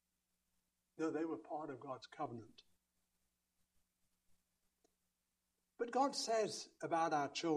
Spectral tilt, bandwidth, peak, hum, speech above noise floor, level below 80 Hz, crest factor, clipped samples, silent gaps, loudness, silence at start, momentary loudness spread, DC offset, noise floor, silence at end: -3.5 dB/octave; 13 kHz; -24 dBFS; 60 Hz at -85 dBFS; 47 dB; -88 dBFS; 20 dB; under 0.1%; none; -41 LUFS; 1 s; 11 LU; under 0.1%; -88 dBFS; 0 s